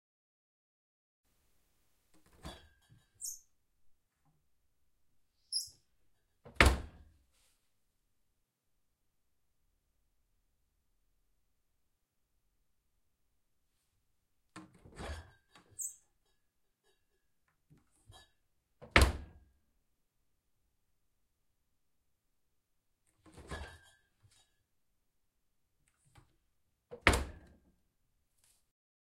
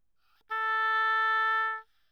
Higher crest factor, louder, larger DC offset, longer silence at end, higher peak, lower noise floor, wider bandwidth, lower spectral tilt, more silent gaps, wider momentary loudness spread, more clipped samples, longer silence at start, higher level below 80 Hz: first, 38 dB vs 10 dB; second, -33 LUFS vs -27 LUFS; neither; first, 1.75 s vs 0.3 s; first, -6 dBFS vs -20 dBFS; first, -83 dBFS vs -71 dBFS; first, 16 kHz vs 14.5 kHz; first, -3.5 dB/octave vs 2 dB/octave; neither; first, 27 LU vs 9 LU; neither; first, 2.45 s vs 0.5 s; first, -48 dBFS vs -82 dBFS